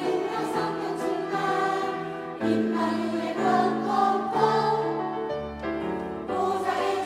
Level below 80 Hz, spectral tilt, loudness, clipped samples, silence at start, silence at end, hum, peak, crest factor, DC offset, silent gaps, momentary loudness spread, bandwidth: -58 dBFS; -6 dB/octave; -26 LUFS; under 0.1%; 0 s; 0 s; none; -8 dBFS; 18 dB; under 0.1%; none; 8 LU; 15.5 kHz